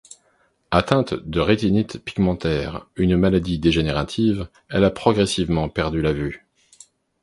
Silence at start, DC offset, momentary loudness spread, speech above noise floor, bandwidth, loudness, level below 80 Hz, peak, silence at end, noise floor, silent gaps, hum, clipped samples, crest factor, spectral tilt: 0.7 s; under 0.1%; 8 LU; 43 dB; 11.5 kHz; -21 LUFS; -38 dBFS; 0 dBFS; 0.85 s; -63 dBFS; none; none; under 0.1%; 20 dB; -6.5 dB/octave